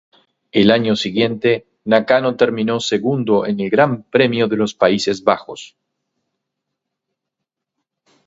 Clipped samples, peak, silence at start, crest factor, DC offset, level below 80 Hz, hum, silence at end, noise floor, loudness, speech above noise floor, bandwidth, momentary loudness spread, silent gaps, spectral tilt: under 0.1%; 0 dBFS; 0.55 s; 18 dB; under 0.1%; -58 dBFS; none; 2.6 s; -81 dBFS; -16 LUFS; 65 dB; 8 kHz; 5 LU; none; -5.5 dB/octave